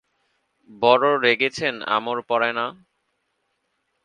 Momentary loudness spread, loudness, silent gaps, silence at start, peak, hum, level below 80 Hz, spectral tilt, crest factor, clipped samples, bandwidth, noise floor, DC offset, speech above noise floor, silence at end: 9 LU; -21 LUFS; none; 0.7 s; 0 dBFS; none; -70 dBFS; -4 dB/octave; 22 dB; under 0.1%; 10 kHz; -73 dBFS; under 0.1%; 52 dB; 1.3 s